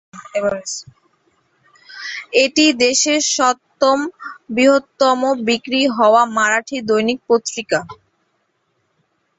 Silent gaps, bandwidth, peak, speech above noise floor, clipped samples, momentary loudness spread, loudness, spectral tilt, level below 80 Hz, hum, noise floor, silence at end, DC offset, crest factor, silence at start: none; 8.4 kHz; 0 dBFS; 51 dB; under 0.1%; 14 LU; -16 LUFS; -2 dB/octave; -62 dBFS; none; -67 dBFS; 1.45 s; under 0.1%; 18 dB; 0.15 s